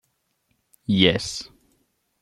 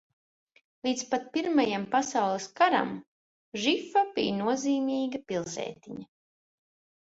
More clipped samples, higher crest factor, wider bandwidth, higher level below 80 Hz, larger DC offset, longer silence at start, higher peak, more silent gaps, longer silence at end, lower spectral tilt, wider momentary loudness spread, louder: neither; about the same, 24 dB vs 20 dB; first, 12.5 kHz vs 8 kHz; first, -54 dBFS vs -72 dBFS; neither; about the same, 0.9 s vs 0.85 s; first, -2 dBFS vs -10 dBFS; second, none vs 3.07-3.52 s; second, 0.75 s vs 1 s; about the same, -4.5 dB/octave vs -4 dB/octave; first, 19 LU vs 13 LU; first, -21 LUFS vs -29 LUFS